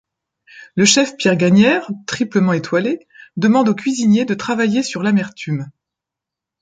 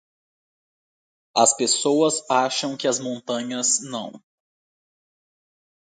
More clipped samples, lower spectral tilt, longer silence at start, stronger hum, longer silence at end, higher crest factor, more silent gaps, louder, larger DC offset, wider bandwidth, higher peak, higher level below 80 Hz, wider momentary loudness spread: neither; first, -4.5 dB/octave vs -2 dB/octave; second, 0.55 s vs 1.35 s; neither; second, 0.9 s vs 1.8 s; second, 16 dB vs 22 dB; neither; first, -16 LUFS vs -21 LUFS; neither; about the same, 9.4 kHz vs 9.8 kHz; first, 0 dBFS vs -4 dBFS; first, -60 dBFS vs -76 dBFS; first, 13 LU vs 10 LU